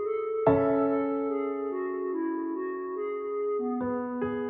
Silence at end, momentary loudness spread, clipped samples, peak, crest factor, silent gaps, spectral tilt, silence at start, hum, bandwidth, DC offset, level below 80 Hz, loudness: 0 s; 9 LU; under 0.1%; -10 dBFS; 20 dB; none; -8 dB/octave; 0 s; none; 3.8 kHz; under 0.1%; -62 dBFS; -29 LUFS